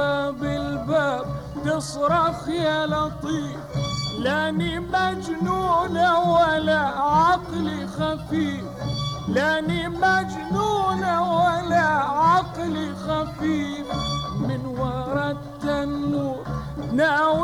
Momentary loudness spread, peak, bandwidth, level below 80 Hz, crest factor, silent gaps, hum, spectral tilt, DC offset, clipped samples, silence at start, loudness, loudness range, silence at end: 9 LU; -8 dBFS; 17 kHz; -44 dBFS; 14 dB; none; none; -5.5 dB/octave; under 0.1%; under 0.1%; 0 s; -23 LUFS; 5 LU; 0 s